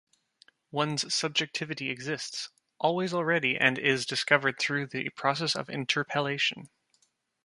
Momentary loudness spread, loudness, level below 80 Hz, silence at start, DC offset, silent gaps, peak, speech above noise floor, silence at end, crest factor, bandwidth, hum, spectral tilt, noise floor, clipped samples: 9 LU; -28 LUFS; -74 dBFS; 0.75 s; under 0.1%; none; -6 dBFS; 42 dB; 0.8 s; 26 dB; 11.5 kHz; none; -3.5 dB/octave; -71 dBFS; under 0.1%